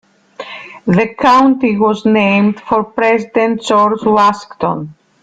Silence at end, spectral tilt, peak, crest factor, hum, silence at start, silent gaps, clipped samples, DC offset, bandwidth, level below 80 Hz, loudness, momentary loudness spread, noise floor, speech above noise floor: 0.3 s; -6.5 dB/octave; 0 dBFS; 12 dB; none; 0.4 s; none; under 0.1%; under 0.1%; 9.2 kHz; -52 dBFS; -12 LUFS; 15 LU; -32 dBFS; 20 dB